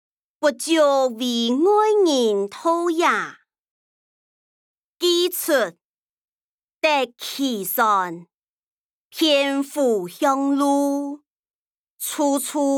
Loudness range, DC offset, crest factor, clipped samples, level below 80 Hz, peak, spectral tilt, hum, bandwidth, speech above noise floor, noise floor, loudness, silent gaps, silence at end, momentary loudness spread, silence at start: 5 LU; under 0.1%; 16 dB; under 0.1%; -82 dBFS; -4 dBFS; -2.5 dB/octave; none; 20 kHz; over 70 dB; under -90 dBFS; -20 LUFS; 3.59-4.95 s, 5.84-6.68 s, 6.74-6.80 s, 8.34-9.10 s, 11.27-11.43 s, 11.55-11.84 s, 11.90-11.97 s; 0 s; 10 LU; 0.4 s